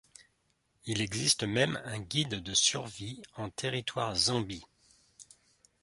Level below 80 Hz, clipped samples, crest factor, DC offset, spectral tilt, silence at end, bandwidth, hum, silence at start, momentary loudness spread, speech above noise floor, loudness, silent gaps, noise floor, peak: -60 dBFS; under 0.1%; 24 dB; under 0.1%; -2.5 dB/octave; 0.6 s; 11.5 kHz; none; 0.2 s; 15 LU; 42 dB; -31 LUFS; none; -75 dBFS; -12 dBFS